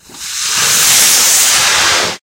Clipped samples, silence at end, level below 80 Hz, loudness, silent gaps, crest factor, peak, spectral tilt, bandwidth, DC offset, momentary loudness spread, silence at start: 0.2%; 0.1 s; -46 dBFS; -7 LUFS; none; 12 dB; 0 dBFS; 1.5 dB/octave; over 20 kHz; under 0.1%; 9 LU; 0.1 s